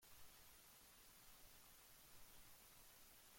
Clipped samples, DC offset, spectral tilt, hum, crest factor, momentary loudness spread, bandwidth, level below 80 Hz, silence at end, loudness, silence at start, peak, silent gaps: under 0.1%; under 0.1%; -1.5 dB/octave; none; 14 dB; 0 LU; 16.5 kHz; -76 dBFS; 0 s; -65 LUFS; 0 s; -50 dBFS; none